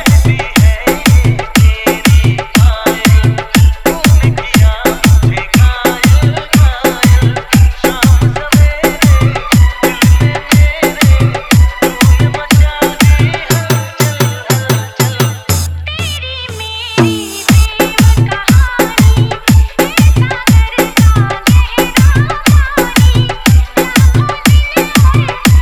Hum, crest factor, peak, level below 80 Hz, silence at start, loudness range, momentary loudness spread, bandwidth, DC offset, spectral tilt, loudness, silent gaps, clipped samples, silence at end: none; 8 dB; 0 dBFS; -14 dBFS; 0 s; 3 LU; 4 LU; over 20 kHz; under 0.1%; -5 dB/octave; -10 LUFS; none; 1%; 0 s